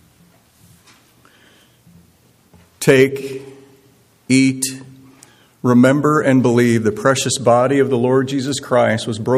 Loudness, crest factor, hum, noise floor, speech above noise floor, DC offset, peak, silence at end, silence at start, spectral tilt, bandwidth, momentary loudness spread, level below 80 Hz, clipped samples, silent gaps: -15 LUFS; 18 dB; none; -53 dBFS; 39 dB; under 0.1%; 0 dBFS; 0 s; 2.8 s; -5.5 dB/octave; 15 kHz; 10 LU; -60 dBFS; under 0.1%; none